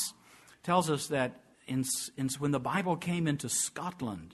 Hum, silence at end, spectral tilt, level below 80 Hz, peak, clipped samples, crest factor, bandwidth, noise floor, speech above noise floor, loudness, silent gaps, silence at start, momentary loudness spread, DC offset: none; 0 s; -4 dB/octave; -66 dBFS; -12 dBFS; under 0.1%; 20 dB; 12.5 kHz; -59 dBFS; 27 dB; -32 LUFS; none; 0 s; 8 LU; under 0.1%